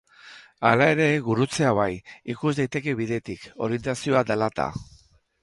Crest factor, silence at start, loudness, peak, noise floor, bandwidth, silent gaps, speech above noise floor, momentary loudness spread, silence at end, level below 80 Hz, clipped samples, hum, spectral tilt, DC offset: 22 dB; 0.25 s; -24 LUFS; -2 dBFS; -49 dBFS; 11.5 kHz; none; 25 dB; 12 LU; 0.6 s; -54 dBFS; under 0.1%; none; -6 dB/octave; under 0.1%